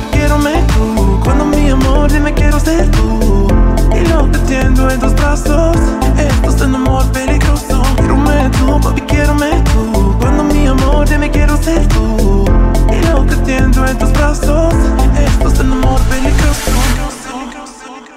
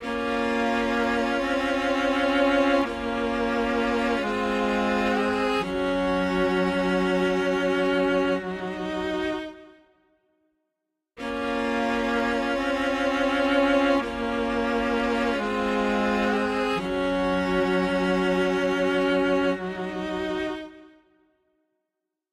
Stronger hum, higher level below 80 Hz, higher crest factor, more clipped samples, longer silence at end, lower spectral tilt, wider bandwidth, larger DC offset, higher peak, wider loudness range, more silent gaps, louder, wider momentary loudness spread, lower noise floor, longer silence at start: neither; first, -12 dBFS vs -48 dBFS; about the same, 10 dB vs 14 dB; neither; second, 0.1 s vs 1.5 s; about the same, -6 dB/octave vs -5.5 dB/octave; first, 15.5 kHz vs 13 kHz; first, 0.2% vs under 0.1%; first, 0 dBFS vs -10 dBFS; second, 1 LU vs 5 LU; neither; first, -12 LUFS vs -24 LUFS; second, 2 LU vs 7 LU; second, -30 dBFS vs -84 dBFS; about the same, 0 s vs 0 s